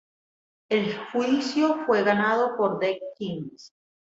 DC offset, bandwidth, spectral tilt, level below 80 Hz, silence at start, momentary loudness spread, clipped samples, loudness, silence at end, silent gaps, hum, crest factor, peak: under 0.1%; 8 kHz; -5.5 dB/octave; -70 dBFS; 0.7 s; 11 LU; under 0.1%; -25 LUFS; 0.45 s; none; none; 18 dB; -8 dBFS